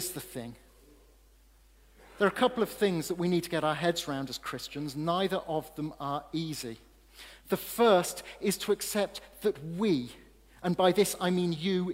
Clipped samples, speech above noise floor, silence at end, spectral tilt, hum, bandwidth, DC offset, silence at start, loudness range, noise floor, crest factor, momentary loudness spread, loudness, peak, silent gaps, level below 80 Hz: under 0.1%; 30 dB; 0 s; -4.5 dB/octave; none; 16 kHz; under 0.1%; 0 s; 4 LU; -60 dBFS; 20 dB; 13 LU; -30 LUFS; -10 dBFS; none; -60 dBFS